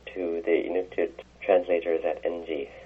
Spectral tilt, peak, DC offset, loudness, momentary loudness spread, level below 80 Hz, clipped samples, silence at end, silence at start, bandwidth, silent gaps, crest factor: -6.5 dB/octave; -8 dBFS; under 0.1%; -28 LUFS; 9 LU; -58 dBFS; under 0.1%; 0 s; 0.05 s; 6.4 kHz; none; 20 dB